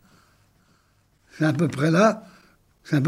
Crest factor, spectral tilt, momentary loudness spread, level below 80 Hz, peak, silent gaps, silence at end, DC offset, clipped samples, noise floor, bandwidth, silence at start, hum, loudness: 18 dB; -7 dB/octave; 8 LU; -66 dBFS; -6 dBFS; none; 0 s; under 0.1%; under 0.1%; -63 dBFS; 13.5 kHz; 1.4 s; none; -22 LUFS